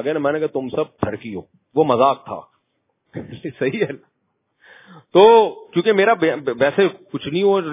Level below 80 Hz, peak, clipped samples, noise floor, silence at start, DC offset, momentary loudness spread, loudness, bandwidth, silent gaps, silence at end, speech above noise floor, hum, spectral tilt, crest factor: -56 dBFS; 0 dBFS; under 0.1%; -71 dBFS; 0 s; under 0.1%; 20 LU; -18 LUFS; 3.9 kHz; none; 0 s; 53 dB; none; -10 dB/octave; 18 dB